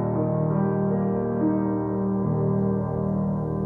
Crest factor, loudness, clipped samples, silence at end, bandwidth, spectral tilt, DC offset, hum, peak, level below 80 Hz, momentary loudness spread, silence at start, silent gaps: 12 dB; -25 LUFS; under 0.1%; 0 s; 2.5 kHz; -13 dB/octave; under 0.1%; none; -12 dBFS; -46 dBFS; 2 LU; 0 s; none